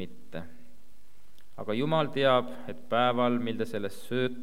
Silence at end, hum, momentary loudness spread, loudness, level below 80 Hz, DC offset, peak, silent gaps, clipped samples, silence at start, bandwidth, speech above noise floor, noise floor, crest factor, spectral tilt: 0 s; none; 18 LU; -28 LUFS; -66 dBFS; 2%; -10 dBFS; none; under 0.1%; 0 s; 16.5 kHz; 33 dB; -62 dBFS; 20 dB; -6.5 dB/octave